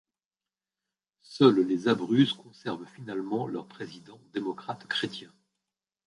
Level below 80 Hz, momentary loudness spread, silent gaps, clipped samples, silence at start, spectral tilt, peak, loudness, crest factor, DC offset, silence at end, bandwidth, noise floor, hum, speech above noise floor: -74 dBFS; 20 LU; none; under 0.1%; 1.3 s; -6.5 dB/octave; -6 dBFS; -28 LUFS; 24 dB; under 0.1%; 0.8 s; 11 kHz; under -90 dBFS; none; over 62 dB